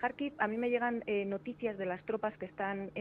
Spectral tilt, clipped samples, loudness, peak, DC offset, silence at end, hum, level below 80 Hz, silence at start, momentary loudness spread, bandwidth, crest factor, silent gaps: -8.5 dB/octave; under 0.1%; -36 LUFS; -16 dBFS; under 0.1%; 0 s; none; -70 dBFS; 0 s; 6 LU; 4.5 kHz; 20 dB; none